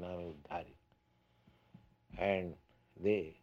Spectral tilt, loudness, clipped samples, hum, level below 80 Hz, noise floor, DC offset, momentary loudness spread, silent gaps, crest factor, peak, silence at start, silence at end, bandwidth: -8 dB/octave; -39 LUFS; under 0.1%; none; -64 dBFS; -73 dBFS; under 0.1%; 20 LU; none; 22 dB; -18 dBFS; 0 s; 0.1 s; 6.8 kHz